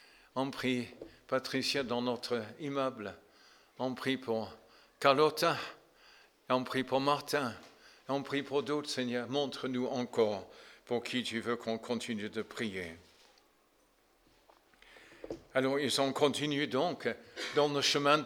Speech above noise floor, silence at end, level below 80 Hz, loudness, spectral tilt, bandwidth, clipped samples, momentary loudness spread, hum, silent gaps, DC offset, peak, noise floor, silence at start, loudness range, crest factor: 36 dB; 0 s; -74 dBFS; -34 LUFS; -4 dB/octave; 19 kHz; under 0.1%; 14 LU; none; none; under 0.1%; -10 dBFS; -70 dBFS; 0.35 s; 7 LU; 24 dB